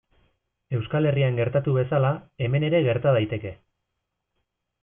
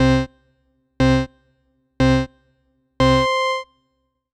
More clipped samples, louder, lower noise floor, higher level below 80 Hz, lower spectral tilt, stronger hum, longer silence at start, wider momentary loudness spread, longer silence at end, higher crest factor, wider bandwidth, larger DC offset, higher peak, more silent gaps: neither; second, -24 LUFS vs -19 LUFS; first, -80 dBFS vs -70 dBFS; second, -58 dBFS vs -34 dBFS; first, -11.5 dB/octave vs -6.5 dB/octave; neither; first, 0.7 s vs 0 s; second, 9 LU vs 14 LU; first, 1.3 s vs 0.7 s; about the same, 18 dB vs 16 dB; second, 3.6 kHz vs 10.5 kHz; neither; second, -8 dBFS vs -4 dBFS; neither